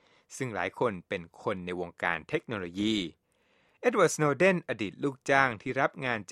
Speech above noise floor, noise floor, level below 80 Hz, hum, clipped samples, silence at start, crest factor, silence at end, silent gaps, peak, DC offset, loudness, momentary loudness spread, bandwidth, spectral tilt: 39 dB; -69 dBFS; -66 dBFS; none; under 0.1%; 0.3 s; 22 dB; 0 s; none; -8 dBFS; under 0.1%; -30 LUFS; 12 LU; 13 kHz; -4.5 dB/octave